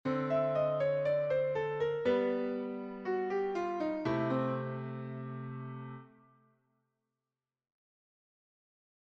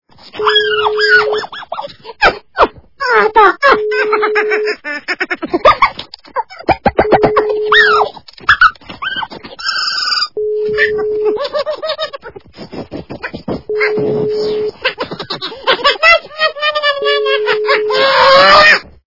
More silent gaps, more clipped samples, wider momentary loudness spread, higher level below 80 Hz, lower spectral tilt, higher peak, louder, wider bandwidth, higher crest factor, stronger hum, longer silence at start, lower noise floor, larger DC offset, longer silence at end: neither; second, under 0.1% vs 0.5%; second, 12 LU vs 16 LU; second, -72 dBFS vs -42 dBFS; first, -8.5 dB/octave vs -3.5 dB/octave; second, -20 dBFS vs 0 dBFS; second, -34 LUFS vs -12 LUFS; first, 7.2 kHz vs 6 kHz; about the same, 16 dB vs 14 dB; neither; second, 0.05 s vs 0.25 s; first, under -90 dBFS vs -32 dBFS; second, under 0.1% vs 0.4%; first, 3 s vs 0.3 s